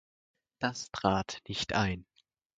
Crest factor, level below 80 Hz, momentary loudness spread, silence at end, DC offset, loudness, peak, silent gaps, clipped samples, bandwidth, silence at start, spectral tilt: 24 dB; -54 dBFS; 6 LU; 0.55 s; under 0.1%; -33 LUFS; -10 dBFS; none; under 0.1%; 9.4 kHz; 0.6 s; -4.5 dB/octave